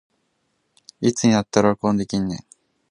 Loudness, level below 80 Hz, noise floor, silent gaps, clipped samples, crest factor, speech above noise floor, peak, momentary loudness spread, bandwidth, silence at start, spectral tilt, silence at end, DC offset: -20 LUFS; -52 dBFS; -70 dBFS; none; under 0.1%; 22 dB; 51 dB; 0 dBFS; 9 LU; 11 kHz; 1 s; -5.5 dB/octave; 0.55 s; under 0.1%